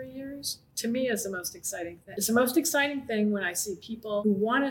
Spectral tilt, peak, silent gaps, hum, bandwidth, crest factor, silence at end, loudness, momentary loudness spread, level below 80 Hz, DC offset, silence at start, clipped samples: -3.5 dB/octave; -10 dBFS; none; none; 17 kHz; 18 dB; 0 s; -29 LUFS; 10 LU; -66 dBFS; under 0.1%; 0 s; under 0.1%